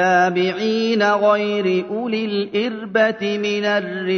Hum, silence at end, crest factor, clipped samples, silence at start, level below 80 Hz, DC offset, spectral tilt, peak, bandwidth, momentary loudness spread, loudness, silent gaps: none; 0 s; 16 dB; under 0.1%; 0 s; -66 dBFS; under 0.1%; -5.5 dB/octave; -2 dBFS; 6.6 kHz; 6 LU; -19 LUFS; none